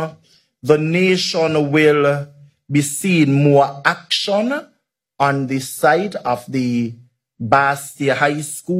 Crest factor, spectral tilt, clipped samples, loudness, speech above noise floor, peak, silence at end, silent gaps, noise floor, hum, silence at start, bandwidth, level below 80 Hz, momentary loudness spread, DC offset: 18 dB; -5 dB/octave; under 0.1%; -17 LUFS; 20 dB; 0 dBFS; 0 s; none; -36 dBFS; none; 0 s; 16 kHz; -62 dBFS; 10 LU; under 0.1%